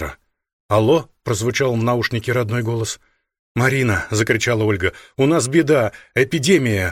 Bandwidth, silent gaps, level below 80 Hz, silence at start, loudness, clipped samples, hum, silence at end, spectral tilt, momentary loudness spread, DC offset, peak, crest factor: 16 kHz; 0.53-0.69 s, 3.39-3.55 s; -46 dBFS; 0 s; -18 LUFS; under 0.1%; none; 0 s; -5 dB/octave; 8 LU; under 0.1%; -2 dBFS; 16 dB